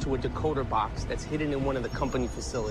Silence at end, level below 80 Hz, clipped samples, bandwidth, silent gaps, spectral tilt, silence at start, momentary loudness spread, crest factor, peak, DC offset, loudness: 0 s; -38 dBFS; under 0.1%; 14 kHz; none; -6 dB/octave; 0 s; 4 LU; 14 dB; -16 dBFS; under 0.1%; -30 LUFS